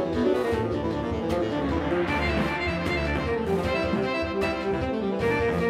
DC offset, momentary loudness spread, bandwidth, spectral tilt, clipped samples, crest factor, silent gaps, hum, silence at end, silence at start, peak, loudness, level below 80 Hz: under 0.1%; 3 LU; 15 kHz; -6.5 dB/octave; under 0.1%; 14 dB; none; none; 0 s; 0 s; -12 dBFS; -26 LUFS; -38 dBFS